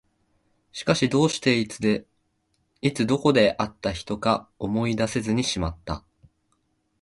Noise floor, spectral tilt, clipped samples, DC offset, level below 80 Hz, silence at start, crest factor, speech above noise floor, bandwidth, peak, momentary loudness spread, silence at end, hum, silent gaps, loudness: -71 dBFS; -5 dB/octave; under 0.1%; under 0.1%; -46 dBFS; 0.75 s; 20 dB; 48 dB; 11.5 kHz; -4 dBFS; 10 LU; 1.05 s; none; none; -24 LUFS